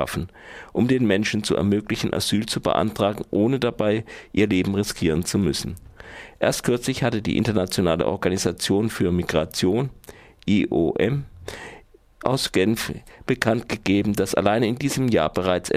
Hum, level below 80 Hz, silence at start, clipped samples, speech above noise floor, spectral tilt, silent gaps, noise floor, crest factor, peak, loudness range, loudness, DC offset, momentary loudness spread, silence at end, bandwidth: none; -46 dBFS; 0 s; under 0.1%; 23 dB; -5.5 dB/octave; none; -46 dBFS; 20 dB; -2 dBFS; 2 LU; -22 LUFS; under 0.1%; 11 LU; 0 s; 16 kHz